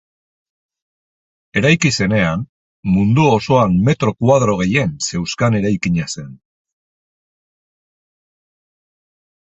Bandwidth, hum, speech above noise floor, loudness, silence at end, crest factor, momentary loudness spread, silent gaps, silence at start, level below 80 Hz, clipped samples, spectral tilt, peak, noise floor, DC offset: 8.4 kHz; none; over 75 dB; -16 LUFS; 3.1 s; 18 dB; 10 LU; 2.49-2.83 s; 1.55 s; -44 dBFS; under 0.1%; -5.5 dB/octave; 0 dBFS; under -90 dBFS; under 0.1%